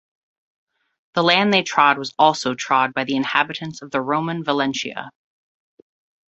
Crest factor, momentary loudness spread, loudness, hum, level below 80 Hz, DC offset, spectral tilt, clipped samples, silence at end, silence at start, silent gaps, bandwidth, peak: 20 dB; 11 LU; -19 LUFS; none; -66 dBFS; under 0.1%; -4 dB/octave; under 0.1%; 1.2 s; 1.15 s; none; 8.2 kHz; -2 dBFS